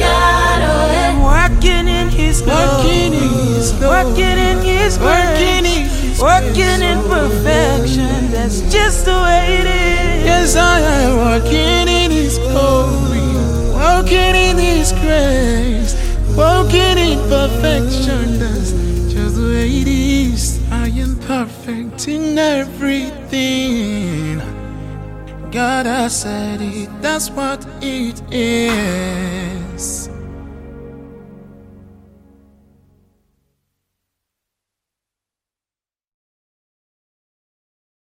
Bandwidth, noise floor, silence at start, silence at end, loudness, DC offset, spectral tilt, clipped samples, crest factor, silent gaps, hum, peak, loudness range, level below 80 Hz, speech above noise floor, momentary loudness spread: 15.5 kHz; under -90 dBFS; 0 s; 6.75 s; -14 LUFS; under 0.1%; -4.5 dB/octave; under 0.1%; 14 dB; none; none; 0 dBFS; 7 LU; -18 dBFS; over 77 dB; 11 LU